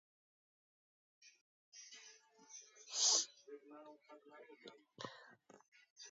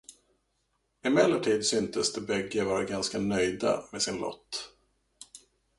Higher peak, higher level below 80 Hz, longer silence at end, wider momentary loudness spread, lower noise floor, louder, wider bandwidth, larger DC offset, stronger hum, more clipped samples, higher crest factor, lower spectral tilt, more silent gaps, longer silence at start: second, -22 dBFS vs -8 dBFS; second, under -90 dBFS vs -62 dBFS; second, 0 s vs 0.4 s; first, 28 LU vs 13 LU; second, -65 dBFS vs -76 dBFS; second, -37 LUFS vs -29 LUFS; second, 7.6 kHz vs 11.5 kHz; neither; neither; neither; about the same, 26 dB vs 22 dB; second, 1 dB/octave vs -3.5 dB/octave; first, 1.41-1.72 s, 5.68-5.72 s, 5.90-5.96 s vs none; first, 1.25 s vs 0.1 s